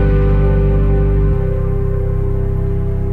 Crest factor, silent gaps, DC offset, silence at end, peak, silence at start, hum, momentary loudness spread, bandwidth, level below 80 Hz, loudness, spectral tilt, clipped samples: 10 dB; none; under 0.1%; 0 s; -2 dBFS; 0 s; none; 5 LU; 3.4 kHz; -16 dBFS; -16 LUFS; -11 dB/octave; under 0.1%